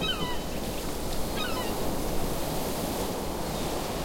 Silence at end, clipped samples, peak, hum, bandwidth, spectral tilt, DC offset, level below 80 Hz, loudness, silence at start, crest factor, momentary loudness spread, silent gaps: 0 s; under 0.1%; -16 dBFS; none; 16.5 kHz; -4 dB/octave; 0.5%; -38 dBFS; -31 LUFS; 0 s; 14 dB; 3 LU; none